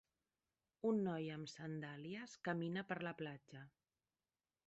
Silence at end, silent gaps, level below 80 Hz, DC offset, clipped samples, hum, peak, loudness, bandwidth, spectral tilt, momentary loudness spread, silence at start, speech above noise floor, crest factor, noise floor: 1 s; none; -84 dBFS; under 0.1%; under 0.1%; none; -30 dBFS; -45 LUFS; 8 kHz; -5.5 dB/octave; 16 LU; 0.85 s; over 45 dB; 18 dB; under -90 dBFS